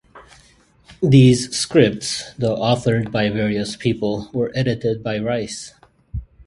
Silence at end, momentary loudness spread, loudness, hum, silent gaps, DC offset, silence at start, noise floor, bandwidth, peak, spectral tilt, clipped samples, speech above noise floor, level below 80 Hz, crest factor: 0.25 s; 15 LU; -19 LUFS; none; none; under 0.1%; 0.15 s; -53 dBFS; 11.5 kHz; 0 dBFS; -6 dB/octave; under 0.1%; 35 dB; -44 dBFS; 20 dB